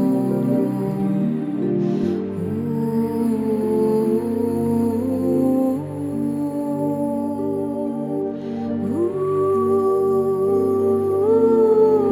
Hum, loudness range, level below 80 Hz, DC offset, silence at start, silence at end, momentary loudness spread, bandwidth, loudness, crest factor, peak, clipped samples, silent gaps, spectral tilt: none; 5 LU; -58 dBFS; under 0.1%; 0 s; 0 s; 8 LU; 15 kHz; -20 LUFS; 14 dB; -6 dBFS; under 0.1%; none; -9.5 dB/octave